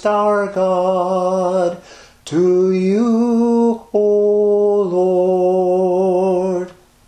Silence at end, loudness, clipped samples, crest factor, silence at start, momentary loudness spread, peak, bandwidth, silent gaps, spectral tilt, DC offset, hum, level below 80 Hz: 0.35 s; -16 LUFS; under 0.1%; 12 dB; 0 s; 6 LU; -4 dBFS; 9.6 kHz; none; -7.5 dB/octave; under 0.1%; none; -56 dBFS